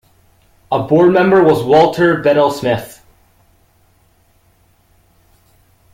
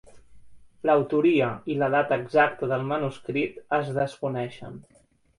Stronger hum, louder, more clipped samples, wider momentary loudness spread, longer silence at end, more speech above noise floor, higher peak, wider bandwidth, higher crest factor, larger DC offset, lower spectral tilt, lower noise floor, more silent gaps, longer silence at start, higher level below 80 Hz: neither; first, -12 LUFS vs -25 LUFS; neither; about the same, 10 LU vs 9 LU; first, 3.05 s vs 0.55 s; first, 43 dB vs 22 dB; first, 0 dBFS vs -6 dBFS; first, 16 kHz vs 11 kHz; second, 14 dB vs 20 dB; neither; about the same, -7 dB/octave vs -7.5 dB/octave; first, -54 dBFS vs -47 dBFS; neither; first, 0.7 s vs 0.15 s; first, -50 dBFS vs -62 dBFS